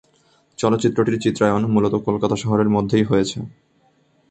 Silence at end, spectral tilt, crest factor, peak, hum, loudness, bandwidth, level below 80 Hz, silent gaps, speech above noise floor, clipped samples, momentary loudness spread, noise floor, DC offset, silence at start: 0.8 s; -6.5 dB/octave; 18 dB; -2 dBFS; none; -19 LUFS; 8.8 kHz; -50 dBFS; none; 42 dB; under 0.1%; 5 LU; -60 dBFS; under 0.1%; 0.6 s